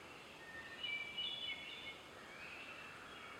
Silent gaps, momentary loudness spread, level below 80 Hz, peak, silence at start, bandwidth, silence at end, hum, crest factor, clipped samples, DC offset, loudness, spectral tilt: none; 12 LU; -76 dBFS; -32 dBFS; 0 s; 16.5 kHz; 0 s; none; 18 dB; under 0.1%; under 0.1%; -46 LUFS; -2 dB/octave